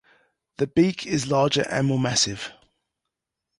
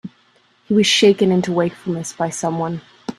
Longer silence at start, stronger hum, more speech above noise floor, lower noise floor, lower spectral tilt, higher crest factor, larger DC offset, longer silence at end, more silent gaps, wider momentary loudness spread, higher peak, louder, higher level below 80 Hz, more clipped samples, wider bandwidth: first, 0.6 s vs 0.05 s; neither; first, 61 dB vs 40 dB; first, -84 dBFS vs -57 dBFS; about the same, -4.5 dB/octave vs -4.5 dB/octave; about the same, 18 dB vs 18 dB; neither; first, 1.05 s vs 0.05 s; neither; second, 8 LU vs 13 LU; second, -8 dBFS vs 0 dBFS; second, -22 LUFS vs -17 LUFS; about the same, -56 dBFS vs -60 dBFS; neither; second, 11.5 kHz vs 13 kHz